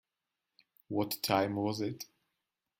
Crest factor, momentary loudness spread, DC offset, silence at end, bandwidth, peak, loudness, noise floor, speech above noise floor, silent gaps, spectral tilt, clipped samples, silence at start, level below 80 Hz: 24 dB; 13 LU; under 0.1%; 0.75 s; 16.5 kHz; -14 dBFS; -34 LUFS; -89 dBFS; 56 dB; none; -5 dB/octave; under 0.1%; 0.9 s; -74 dBFS